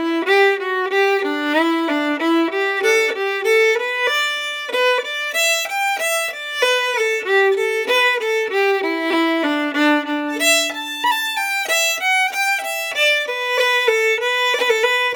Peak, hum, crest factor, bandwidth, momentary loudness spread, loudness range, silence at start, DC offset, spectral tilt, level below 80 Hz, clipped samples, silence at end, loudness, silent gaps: -2 dBFS; none; 16 dB; over 20 kHz; 5 LU; 1 LU; 0 s; under 0.1%; 0.5 dB/octave; -68 dBFS; under 0.1%; 0 s; -17 LUFS; none